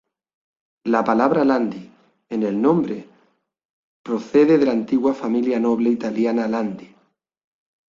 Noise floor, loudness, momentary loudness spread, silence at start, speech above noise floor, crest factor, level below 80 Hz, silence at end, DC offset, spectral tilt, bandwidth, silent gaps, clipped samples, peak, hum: -64 dBFS; -20 LUFS; 13 LU; 0.85 s; 45 dB; 20 dB; -64 dBFS; 1.05 s; under 0.1%; -7.5 dB/octave; 7.4 kHz; 3.65-4.04 s; under 0.1%; -2 dBFS; none